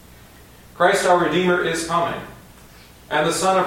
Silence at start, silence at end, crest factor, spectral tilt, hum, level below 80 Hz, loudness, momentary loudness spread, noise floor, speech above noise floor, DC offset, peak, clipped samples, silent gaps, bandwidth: 0.75 s; 0 s; 18 dB; -4 dB/octave; none; -50 dBFS; -19 LUFS; 9 LU; -45 dBFS; 27 dB; under 0.1%; -2 dBFS; under 0.1%; none; 17 kHz